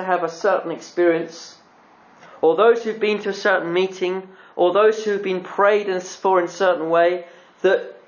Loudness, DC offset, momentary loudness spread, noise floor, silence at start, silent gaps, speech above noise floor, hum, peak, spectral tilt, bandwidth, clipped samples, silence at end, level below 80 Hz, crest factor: -20 LUFS; under 0.1%; 9 LU; -51 dBFS; 0 s; none; 32 dB; none; -4 dBFS; -4.5 dB/octave; 7.2 kHz; under 0.1%; 0.15 s; -78 dBFS; 16 dB